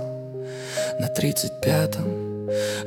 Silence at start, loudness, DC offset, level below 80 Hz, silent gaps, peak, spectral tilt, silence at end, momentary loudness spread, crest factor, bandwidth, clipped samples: 0 s; -25 LUFS; under 0.1%; -58 dBFS; none; -8 dBFS; -5 dB/octave; 0 s; 11 LU; 18 dB; 18 kHz; under 0.1%